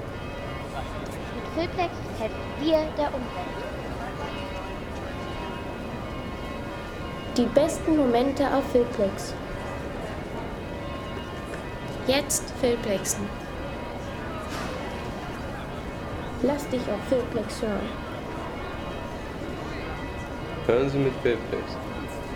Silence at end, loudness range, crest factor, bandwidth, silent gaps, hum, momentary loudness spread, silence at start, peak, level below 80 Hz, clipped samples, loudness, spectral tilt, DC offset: 0 s; 8 LU; 22 dB; 19.5 kHz; none; none; 11 LU; 0 s; -6 dBFS; -42 dBFS; under 0.1%; -29 LUFS; -5 dB/octave; under 0.1%